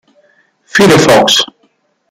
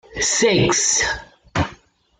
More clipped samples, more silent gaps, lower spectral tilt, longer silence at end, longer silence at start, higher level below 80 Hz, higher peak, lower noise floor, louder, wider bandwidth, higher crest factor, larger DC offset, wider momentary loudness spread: neither; neither; about the same, -3.5 dB/octave vs -2.5 dB/octave; first, 0.65 s vs 0.45 s; first, 0.75 s vs 0.1 s; about the same, -44 dBFS vs -42 dBFS; first, 0 dBFS vs -4 dBFS; first, -56 dBFS vs -47 dBFS; first, -8 LUFS vs -18 LUFS; first, 16.5 kHz vs 11 kHz; second, 10 dB vs 16 dB; neither; second, 9 LU vs 12 LU